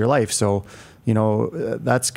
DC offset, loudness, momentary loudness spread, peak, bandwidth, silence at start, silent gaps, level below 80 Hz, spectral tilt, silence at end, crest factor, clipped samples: under 0.1%; -21 LUFS; 9 LU; -4 dBFS; 16 kHz; 0 s; none; -58 dBFS; -5 dB/octave; 0 s; 18 dB; under 0.1%